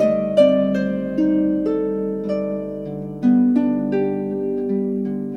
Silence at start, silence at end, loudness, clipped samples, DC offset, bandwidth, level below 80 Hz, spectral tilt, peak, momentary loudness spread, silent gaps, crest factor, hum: 0 s; 0 s; -20 LUFS; under 0.1%; under 0.1%; 6.4 kHz; -50 dBFS; -9 dB/octave; -2 dBFS; 9 LU; none; 16 dB; none